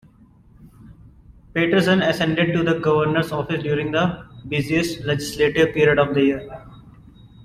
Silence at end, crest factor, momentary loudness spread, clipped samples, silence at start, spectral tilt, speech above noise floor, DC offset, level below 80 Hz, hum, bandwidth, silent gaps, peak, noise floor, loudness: 0 s; 16 dB; 9 LU; under 0.1%; 0.6 s; -6 dB/octave; 31 dB; under 0.1%; -48 dBFS; none; 15 kHz; none; -4 dBFS; -51 dBFS; -20 LUFS